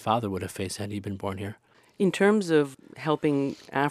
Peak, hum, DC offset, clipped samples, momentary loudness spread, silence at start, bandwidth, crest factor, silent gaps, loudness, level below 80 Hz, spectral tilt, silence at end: -10 dBFS; none; under 0.1%; under 0.1%; 11 LU; 0 s; 15 kHz; 18 dB; none; -27 LUFS; -66 dBFS; -6 dB/octave; 0 s